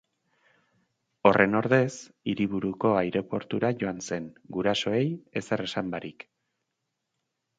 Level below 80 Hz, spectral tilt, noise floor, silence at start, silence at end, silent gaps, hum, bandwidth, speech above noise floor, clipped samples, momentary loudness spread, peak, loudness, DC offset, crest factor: -62 dBFS; -5.5 dB/octave; -82 dBFS; 1.25 s; 1.5 s; none; none; 9.2 kHz; 55 dB; under 0.1%; 12 LU; -4 dBFS; -27 LUFS; under 0.1%; 24 dB